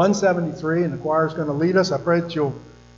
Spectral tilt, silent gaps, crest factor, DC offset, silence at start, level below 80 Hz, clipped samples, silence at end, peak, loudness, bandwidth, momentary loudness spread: -6 dB/octave; none; 14 dB; under 0.1%; 0 s; -54 dBFS; under 0.1%; 0.3 s; -6 dBFS; -21 LUFS; 7.8 kHz; 6 LU